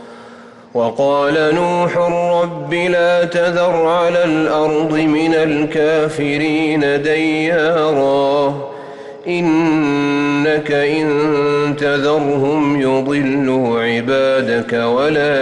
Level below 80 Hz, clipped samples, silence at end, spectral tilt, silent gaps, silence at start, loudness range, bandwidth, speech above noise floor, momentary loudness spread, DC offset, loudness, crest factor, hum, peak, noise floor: -52 dBFS; under 0.1%; 0 s; -6 dB/octave; none; 0 s; 1 LU; 11 kHz; 24 dB; 3 LU; under 0.1%; -15 LUFS; 8 dB; none; -6 dBFS; -38 dBFS